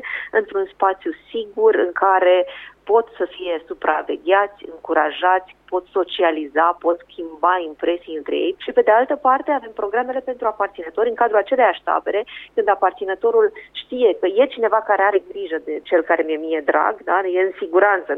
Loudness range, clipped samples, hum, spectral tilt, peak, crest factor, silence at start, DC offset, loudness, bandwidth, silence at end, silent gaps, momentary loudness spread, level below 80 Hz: 2 LU; under 0.1%; none; -6 dB/octave; -4 dBFS; 16 dB; 0 s; under 0.1%; -19 LUFS; 4.1 kHz; 0 s; none; 10 LU; -62 dBFS